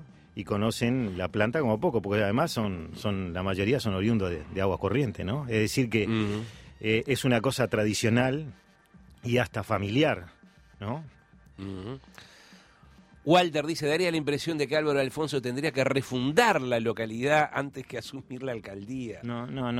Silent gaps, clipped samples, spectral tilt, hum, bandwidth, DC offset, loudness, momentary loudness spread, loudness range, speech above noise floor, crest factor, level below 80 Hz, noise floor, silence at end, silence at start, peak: none; under 0.1%; -5.5 dB/octave; none; 16 kHz; under 0.1%; -28 LUFS; 13 LU; 5 LU; 29 dB; 20 dB; -56 dBFS; -56 dBFS; 0 s; 0 s; -8 dBFS